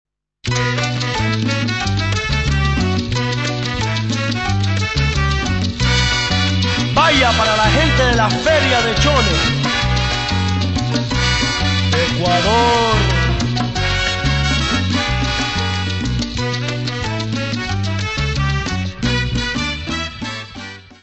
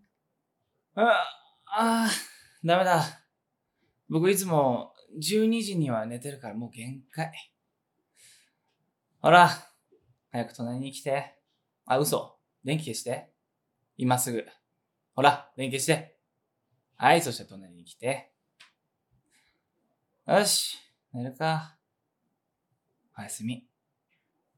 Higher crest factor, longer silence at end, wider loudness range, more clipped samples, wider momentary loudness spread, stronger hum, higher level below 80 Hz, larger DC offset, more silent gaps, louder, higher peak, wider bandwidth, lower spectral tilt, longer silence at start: second, 16 dB vs 28 dB; second, 0.1 s vs 0.95 s; about the same, 6 LU vs 7 LU; neither; second, 8 LU vs 17 LU; neither; first, -26 dBFS vs -86 dBFS; first, 0.5% vs under 0.1%; neither; first, -16 LUFS vs -27 LUFS; about the same, 0 dBFS vs -2 dBFS; second, 8.4 kHz vs 19 kHz; about the same, -4.5 dB/octave vs -4 dB/octave; second, 0.45 s vs 0.95 s